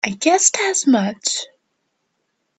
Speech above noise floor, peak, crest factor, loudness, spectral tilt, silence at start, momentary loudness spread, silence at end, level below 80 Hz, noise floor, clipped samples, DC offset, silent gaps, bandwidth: 54 dB; 0 dBFS; 20 dB; -17 LUFS; -2 dB/octave; 0.05 s; 10 LU; 1.15 s; -68 dBFS; -72 dBFS; under 0.1%; under 0.1%; none; 9.2 kHz